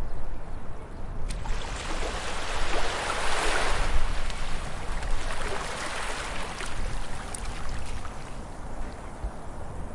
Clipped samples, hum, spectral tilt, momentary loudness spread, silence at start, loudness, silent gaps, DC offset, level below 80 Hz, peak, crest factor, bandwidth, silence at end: under 0.1%; none; -3.5 dB/octave; 13 LU; 0 s; -33 LUFS; none; under 0.1%; -32 dBFS; -10 dBFS; 16 dB; 11.5 kHz; 0 s